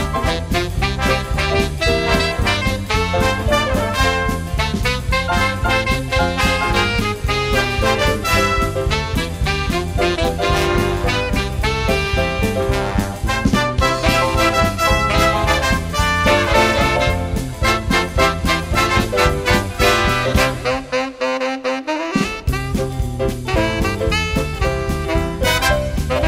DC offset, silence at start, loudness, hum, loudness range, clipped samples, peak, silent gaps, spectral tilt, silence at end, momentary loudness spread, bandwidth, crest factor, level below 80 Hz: under 0.1%; 0 s; -17 LUFS; none; 4 LU; under 0.1%; 0 dBFS; none; -4.5 dB/octave; 0 s; 6 LU; 16 kHz; 16 dB; -24 dBFS